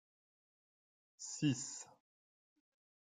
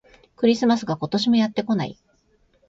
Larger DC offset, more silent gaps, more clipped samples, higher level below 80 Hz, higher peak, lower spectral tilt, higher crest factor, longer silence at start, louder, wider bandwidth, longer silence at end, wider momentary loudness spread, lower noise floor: neither; neither; neither; second, -84 dBFS vs -60 dBFS; second, -24 dBFS vs -6 dBFS; second, -4 dB/octave vs -6 dB/octave; first, 22 dB vs 16 dB; first, 1.2 s vs 0.4 s; second, -41 LUFS vs -22 LUFS; first, 9.6 kHz vs 7.6 kHz; first, 1.15 s vs 0.75 s; first, 14 LU vs 6 LU; first, under -90 dBFS vs -62 dBFS